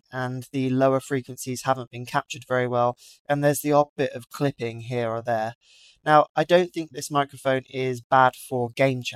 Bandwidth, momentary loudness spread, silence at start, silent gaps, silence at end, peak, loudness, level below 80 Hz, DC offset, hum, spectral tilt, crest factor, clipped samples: 16 kHz; 10 LU; 0.1 s; 1.87-1.91 s, 3.20-3.25 s, 3.89-3.96 s, 5.55-5.61 s, 6.29-6.35 s, 8.04-8.10 s; 0 s; -4 dBFS; -24 LUFS; -68 dBFS; under 0.1%; none; -5.5 dB/octave; 20 dB; under 0.1%